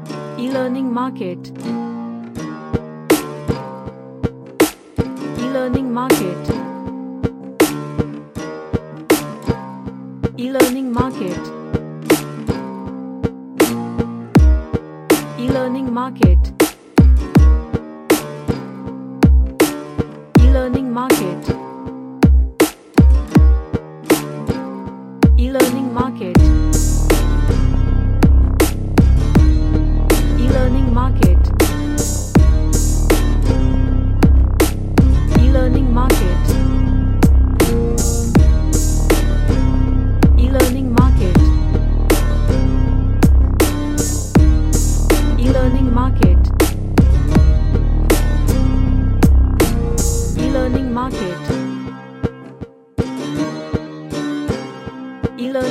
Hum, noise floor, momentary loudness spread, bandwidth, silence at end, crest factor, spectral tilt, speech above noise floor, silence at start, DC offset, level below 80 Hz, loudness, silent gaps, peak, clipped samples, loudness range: none; -35 dBFS; 12 LU; 15 kHz; 0 s; 14 dB; -6.5 dB/octave; 16 dB; 0 s; under 0.1%; -16 dBFS; -16 LUFS; none; 0 dBFS; under 0.1%; 7 LU